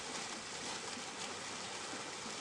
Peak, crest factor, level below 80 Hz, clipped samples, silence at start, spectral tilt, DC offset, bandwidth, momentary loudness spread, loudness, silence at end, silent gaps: -28 dBFS; 16 dB; -76 dBFS; under 0.1%; 0 s; -1 dB/octave; under 0.1%; 11.5 kHz; 1 LU; -43 LUFS; 0 s; none